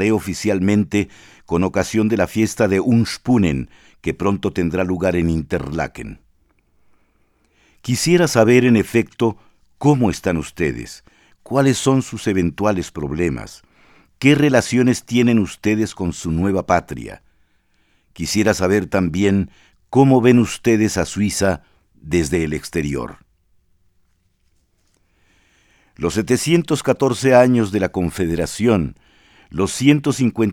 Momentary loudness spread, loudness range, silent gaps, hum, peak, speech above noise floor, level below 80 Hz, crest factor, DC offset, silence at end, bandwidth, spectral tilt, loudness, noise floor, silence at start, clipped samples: 12 LU; 7 LU; none; none; 0 dBFS; 45 dB; -42 dBFS; 18 dB; under 0.1%; 0 s; 16.5 kHz; -6 dB/octave; -18 LUFS; -62 dBFS; 0 s; under 0.1%